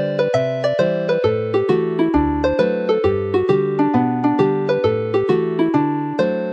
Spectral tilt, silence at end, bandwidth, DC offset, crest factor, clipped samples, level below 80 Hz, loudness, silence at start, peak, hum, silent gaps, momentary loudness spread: -8 dB/octave; 0 s; 7.8 kHz; under 0.1%; 16 dB; under 0.1%; -40 dBFS; -18 LUFS; 0 s; -2 dBFS; none; none; 2 LU